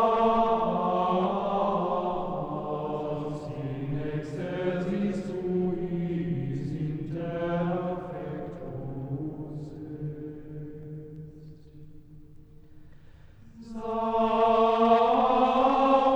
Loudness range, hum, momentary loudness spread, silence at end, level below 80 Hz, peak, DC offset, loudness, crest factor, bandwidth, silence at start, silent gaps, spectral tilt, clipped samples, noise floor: 16 LU; none; 17 LU; 0 s; -52 dBFS; -10 dBFS; under 0.1%; -28 LUFS; 18 dB; 8.6 kHz; 0 s; none; -8.5 dB/octave; under 0.1%; -50 dBFS